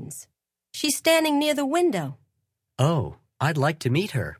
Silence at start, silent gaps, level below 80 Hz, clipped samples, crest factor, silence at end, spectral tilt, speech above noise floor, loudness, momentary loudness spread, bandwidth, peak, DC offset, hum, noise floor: 0 s; none; -54 dBFS; under 0.1%; 18 dB; 0.05 s; -5 dB/octave; 55 dB; -23 LUFS; 16 LU; 16 kHz; -8 dBFS; under 0.1%; none; -78 dBFS